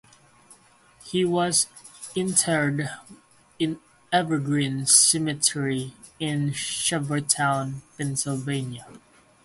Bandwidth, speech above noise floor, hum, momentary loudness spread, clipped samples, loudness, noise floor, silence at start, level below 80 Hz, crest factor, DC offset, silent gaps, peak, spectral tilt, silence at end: 12 kHz; 31 dB; none; 14 LU; under 0.1%; -23 LUFS; -55 dBFS; 0.5 s; -64 dBFS; 24 dB; under 0.1%; none; -2 dBFS; -3 dB/octave; 0.45 s